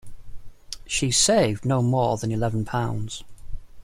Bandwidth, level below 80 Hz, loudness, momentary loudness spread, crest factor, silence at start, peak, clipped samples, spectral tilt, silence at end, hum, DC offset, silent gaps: 16 kHz; -42 dBFS; -23 LUFS; 17 LU; 18 dB; 0.05 s; -6 dBFS; under 0.1%; -4 dB/octave; 0 s; none; under 0.1%; none